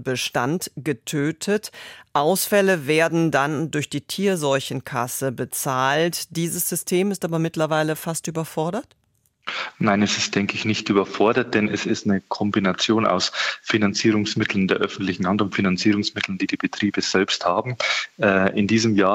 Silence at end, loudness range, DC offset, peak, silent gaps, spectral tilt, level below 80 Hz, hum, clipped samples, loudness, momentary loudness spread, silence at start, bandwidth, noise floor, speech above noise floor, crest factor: 0 s; 3 LU; under 0.1%; -4 dBFS; none; -4.5 dB/octave; -62 dBFS; none; under 0.1%; -22 LUFS; 7 LU; 0 s; 16.5 kHz; -65 dBFS; 44 dB; 18 dB